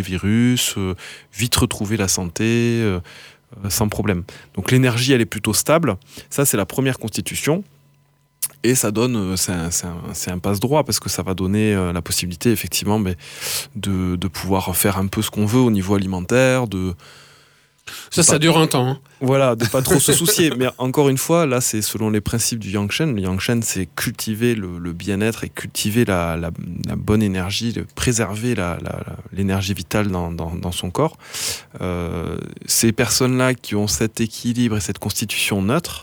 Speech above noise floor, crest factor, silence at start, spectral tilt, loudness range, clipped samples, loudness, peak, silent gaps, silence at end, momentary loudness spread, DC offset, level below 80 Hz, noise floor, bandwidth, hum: 39 dB; 18 dB; 0 s; -4.5 dB/octave; 5 LU; under 0.1%; -19 LUFS; -2 dBFS; none; 0 s; 10 LU; under 0.1%; -44 dBFS; -59 dBFS; over 20 kHz; none